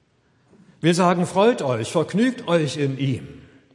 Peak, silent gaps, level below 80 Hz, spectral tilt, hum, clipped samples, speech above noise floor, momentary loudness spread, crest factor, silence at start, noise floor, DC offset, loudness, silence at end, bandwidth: -4 dBFS; none; -64 dBFS; -6 dB/octave; none; under 0.1%; 41 dB; 7 LU; 18 dB; 0.85 s; -62 dBFS; under 0.1%; -21 LUFS; 0.35 s; 11.5 kHz